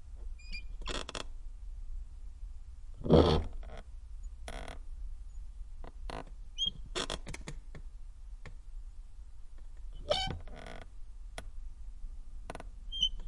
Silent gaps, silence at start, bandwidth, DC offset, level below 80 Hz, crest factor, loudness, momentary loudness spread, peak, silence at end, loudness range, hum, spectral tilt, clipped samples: none; 0 s; 11.5 kHz; under 0.1%; -44 dBFS; 28 dB; -35 LUFS; 20 LU; -8 dBFS; 0 s; 9 LU; none; -5.5 dB/octave; under 0.1%